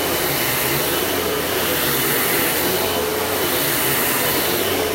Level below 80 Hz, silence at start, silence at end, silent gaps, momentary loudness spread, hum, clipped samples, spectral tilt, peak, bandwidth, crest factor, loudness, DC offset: -44 dBFS; 0 s; 0 s; none; 3 LU; none; under 0.1%; -2.5 dB/octave; -4 dBFS; 16 kHz; 14 dB; -18 LUFS; under 0.1%